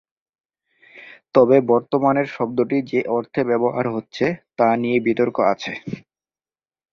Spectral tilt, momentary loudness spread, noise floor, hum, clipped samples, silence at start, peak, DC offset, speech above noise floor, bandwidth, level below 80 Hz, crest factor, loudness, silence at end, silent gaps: -7.5 dB/octave; 10 LU; under -90 dBFS; none; under 0.1%; 0.95 s; -2 dBFS; under 0.1%; over 71 dB; 7 kHz; -62 dBFS; 18 dB; -20 LUFS; 0.95 s; none